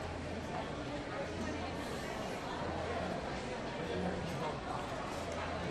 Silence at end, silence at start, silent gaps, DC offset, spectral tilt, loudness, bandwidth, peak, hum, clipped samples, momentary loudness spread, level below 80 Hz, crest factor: 0 s; 0 s; none; under 0.1%; -5.5 dB/octave; -40 LUFS; 13 kHz; -26 dBFS; none; under 0.1%; 3 LU; -54 dBFS; 14 dB